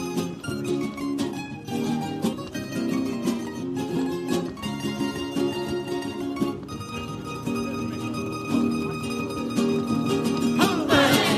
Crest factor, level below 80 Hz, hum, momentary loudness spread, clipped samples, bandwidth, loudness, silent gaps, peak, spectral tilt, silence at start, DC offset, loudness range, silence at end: 20 dB; -54 dBFS; none; 9 LU; under 0.1%; 15.5 kHz; -27 LUFS; none; -6 dBFS; -5 dB/octave; 0 s; under 0.1%; 4 LU; 0 s